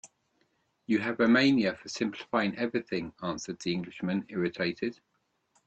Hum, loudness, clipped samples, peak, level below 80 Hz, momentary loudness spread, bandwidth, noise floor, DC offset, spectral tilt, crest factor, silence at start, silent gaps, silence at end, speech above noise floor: none; -30 LUFS; under 0.1%; -12 dBFS; -68 dBFS; 13 LU; 8.6 kHz; -73 dBFS; under 0.1%; -5.5 dB/octave; 18 dB; 0.05 s; none; 0.75 s; 44 dB